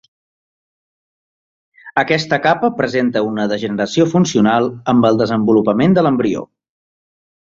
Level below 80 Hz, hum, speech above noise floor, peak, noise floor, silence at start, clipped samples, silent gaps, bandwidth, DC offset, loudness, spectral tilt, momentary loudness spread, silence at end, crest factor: -54 dBFS; none; over 76 dB; -2 dBFS; under -90 dBFS; 1.85 s; under 0.1%; none; 7.6 kHz; under 0.1%; -15 LUFS; -6 dB/octave; 6 LU; 1.05 s; 16 dB